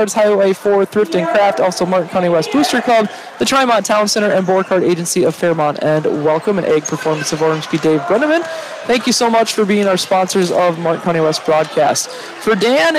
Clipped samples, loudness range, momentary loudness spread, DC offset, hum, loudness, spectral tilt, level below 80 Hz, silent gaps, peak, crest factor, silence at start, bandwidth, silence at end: under 0.1%; 2 LU; 5 LU; under 0.1%; none; -14 LUFS; -4 dB/octave; -58 dBFS; none; -4 dBFS; 10 dB; 0 s; 16 kHz; 0 s